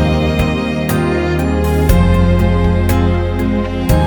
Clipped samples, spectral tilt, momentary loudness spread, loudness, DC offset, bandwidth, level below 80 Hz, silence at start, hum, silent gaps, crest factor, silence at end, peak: under 0.1%; -7 dB/octave; 4 LU; -14 LUFS; under 0.1%; over 20 kHz; -18 dBFS; 0 s; none; none; 12 dB; 0 s; 0 dBFS